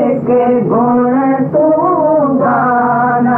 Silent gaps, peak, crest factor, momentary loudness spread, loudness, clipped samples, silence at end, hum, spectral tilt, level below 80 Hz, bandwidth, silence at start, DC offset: none; -4 dBFS; 8 dB; 1 LU; -11 LUFS; under 0.1%; 0 s; none; -11.5 dB/octave; -52 dBFS; 3.1 kHz; 0 s; under 0.1%